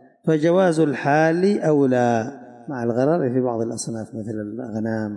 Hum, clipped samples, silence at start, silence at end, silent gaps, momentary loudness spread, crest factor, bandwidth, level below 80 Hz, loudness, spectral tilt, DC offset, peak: none; under 0.1%; 0.25 s; 0 s; none; 12 LU; 14 dB; 11.5 kHz; -66 dBFS; -21 LUFS; -6.5 dB/octave; under 0.1%; -8 dBFS